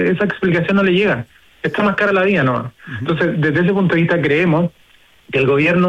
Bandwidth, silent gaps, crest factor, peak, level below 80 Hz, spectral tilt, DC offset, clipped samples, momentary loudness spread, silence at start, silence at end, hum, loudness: 8.2 kHz; none; 10 dB; -4 dBFS; -50 dBFS; -8 dB/octave; under 0.1%; under 0.1%; 9 LU; 0 s; 0 s; none; -16 LUFS